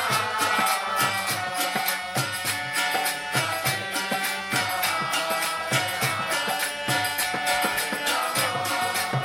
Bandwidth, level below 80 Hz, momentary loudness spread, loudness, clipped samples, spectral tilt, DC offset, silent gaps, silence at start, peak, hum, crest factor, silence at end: 17 kHz; -64 dBFS; 3 LU; -24 LUFS; under 0.1%; -2 dB/octave; under 0.1%; none; 0 s; -10 dBFS; none; 16 dB; 0 s